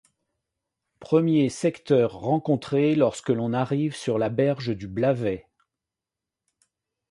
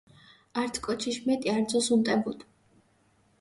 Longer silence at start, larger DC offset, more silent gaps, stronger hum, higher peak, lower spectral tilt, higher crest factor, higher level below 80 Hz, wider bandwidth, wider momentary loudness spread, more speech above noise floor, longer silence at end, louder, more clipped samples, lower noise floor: first, 1 s vs 0.55 s; neither; neither; neither; first, -8 dBFS vs -14 dBFS; first, -7 dB/octave vs -4 dB/octave; about the same, 18 dB vs 16 dB; about the same, -60 dBFS vs -64 dBFS; about the same, 11.5 kHz vs 11.5 kHz; second, 6 LU vs 12 LU; first, 65 dB vs 39 dB; first, 1.7 s vs 0.95 s; first, -24 LUFS vs -28 LUFS; neither; first, -88 dBFS vs -66 dBFS